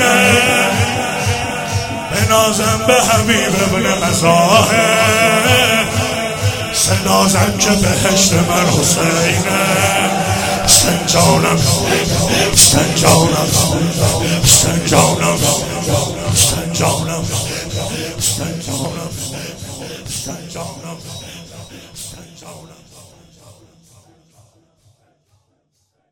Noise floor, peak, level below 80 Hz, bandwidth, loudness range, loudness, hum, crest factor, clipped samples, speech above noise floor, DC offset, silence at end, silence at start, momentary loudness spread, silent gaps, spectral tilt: -65 dBFS; 0 dBFS; -36 dBFS; over 20 kHz; 15 LU; -12 LUFS; none; 14 dB; under 0.1%; 52 dB; under 0.1%; 3.45 s; 0 s; 16 LU; none; -3 dB/octave